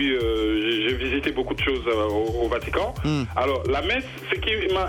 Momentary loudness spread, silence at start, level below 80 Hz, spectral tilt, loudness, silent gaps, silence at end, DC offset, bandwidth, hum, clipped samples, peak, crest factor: 4 LU; 0 s; -36 dBFS; -6 dB/octave; -24 LUFS; none; 0 s; under 0.1%; 17 kHz; none; under 0.1%; -8 dBFS; 16 dB